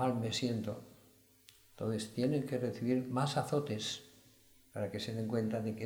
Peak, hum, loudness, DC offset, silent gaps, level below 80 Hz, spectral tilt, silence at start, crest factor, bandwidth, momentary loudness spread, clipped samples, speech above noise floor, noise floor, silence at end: -20 dBFS; none; -37 LUFS; under 0.1%; none; -72 dBFS; -5.5 dB/octave; 0 s; 18 dB; over 20 kHz; 8 LU; under 0.1%; 29 dB; -65 dBFS; 0 s